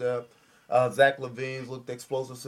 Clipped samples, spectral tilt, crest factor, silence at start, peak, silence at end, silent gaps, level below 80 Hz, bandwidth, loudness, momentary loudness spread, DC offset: under 0.1%; -5 dB/octave; 20 dB; 0 s; -8 dBFS; 0 s; none; -74 dBFS; 15.5 kHz; -27 LUFS; 15 LU; under 0.1%